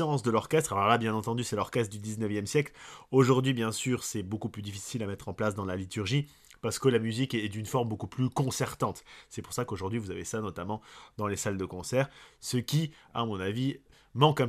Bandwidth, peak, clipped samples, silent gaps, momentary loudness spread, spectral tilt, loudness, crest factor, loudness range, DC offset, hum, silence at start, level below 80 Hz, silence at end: 14.5 kHz; -8 dBFS; under 0.1%; none; 12 LU; -5.5 dB/octave; -31 LUFS; 22 dB; 5 LU; under 0.1%; none; 0 s; -62 dBFS; 0 s